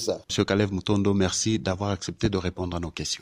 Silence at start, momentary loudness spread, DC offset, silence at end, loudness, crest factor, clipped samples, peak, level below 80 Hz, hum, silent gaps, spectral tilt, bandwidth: 0 s; 7 LU; under 0.1%; 0.05 s; -26 LUFS; 18 dB; under 0.1%; -8 dBFS; -48 dBFS; none; none; -4.5 dB/octave; 15.5 kHz